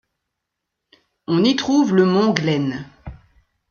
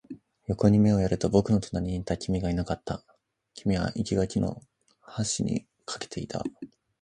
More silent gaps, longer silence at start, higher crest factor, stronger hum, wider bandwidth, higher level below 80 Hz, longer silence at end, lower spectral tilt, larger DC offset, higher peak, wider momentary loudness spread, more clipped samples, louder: neither; first, 1.3 s vs 0.1 s; about the same, 20 dB vs 20 dB; neither; second, 7 kHz vs 10 kHz; second, -52 dBFS vs -46 dBFS; first, 0.55 s vs 0.35 s; about the same, -6 dB/octave vs -6.5 dB/octave; neither; first, 0 dBFS vs -8 dBFS; about the same, 17 LU vs 16 LU; neither; first, -18 LUFS vs -28 LUFS